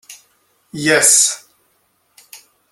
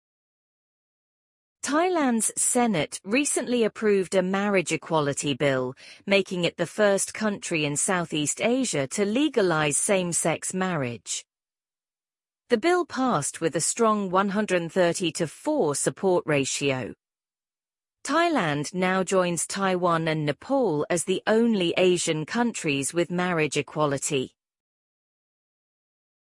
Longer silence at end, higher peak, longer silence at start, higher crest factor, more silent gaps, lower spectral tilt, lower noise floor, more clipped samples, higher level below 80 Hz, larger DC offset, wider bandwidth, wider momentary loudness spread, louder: second, 0.35 s vs 2 s; first, 0 dBFS vs -6 dBFS; second, 0.1 s vs 1.65 s; about the same, 20 dB vs 18 dB; neither; second, -1 dB/octave vs -4 dB/octave; second, -62 dBFS vs under -90 dBFS; neither; about the same, -64 dBFS vs -66 dBFS; neither; first, 17 kHz vs 11.5 kHz; first, 21 LU vs 5 LU; first, -12 LUFS vs -24 LUFS